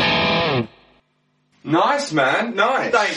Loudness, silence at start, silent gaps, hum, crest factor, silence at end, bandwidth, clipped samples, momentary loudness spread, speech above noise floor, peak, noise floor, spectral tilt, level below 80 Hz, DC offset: -18 LUFS; 0 s; none; none; 18 dB; 0 s; 11 kHz; under 0.1%; 7 LU; 47 dB; -2 dBFS; -65 dBFS; -4.5 dB/octave; -52 dBFS; under 0.1%